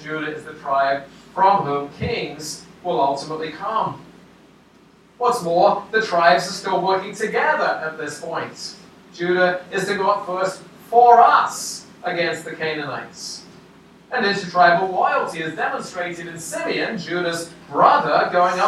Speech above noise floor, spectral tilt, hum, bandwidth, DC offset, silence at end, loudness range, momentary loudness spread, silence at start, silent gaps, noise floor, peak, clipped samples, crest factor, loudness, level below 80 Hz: 32 dB; -4 dB/octave; none; 14 kHz; under 0.1%; 0 s; 6 LU; 14 LU; 0 s; none; -51 dBFS; 0 dBFS; under 0.1%; 20 dB; -20 LUFS; -60 dBFS